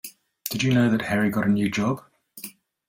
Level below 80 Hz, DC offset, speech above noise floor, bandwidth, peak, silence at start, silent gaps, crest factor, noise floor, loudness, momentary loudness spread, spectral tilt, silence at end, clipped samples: -58 dBFS; under 0.1%; 22 dB; 17 kHz; -6 dBFS; 0.05 s; none; 20 dB; -44 dBFS; -23 LUFS; 19 LU; -5.5 dB/octave; 0.4 s; under 0.1%